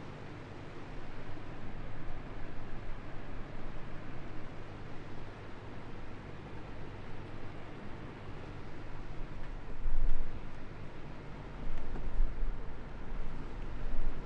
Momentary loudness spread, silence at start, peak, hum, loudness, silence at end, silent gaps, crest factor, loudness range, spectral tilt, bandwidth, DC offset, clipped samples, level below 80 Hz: 7 LU; 0 s; -14 dBFS; none; -46 LUFS; 0 s; none; 18 dB; 4 LU; -7 dB/octave; 4.5 kHz; under 0.1%; under 0.1%; -38 dBFS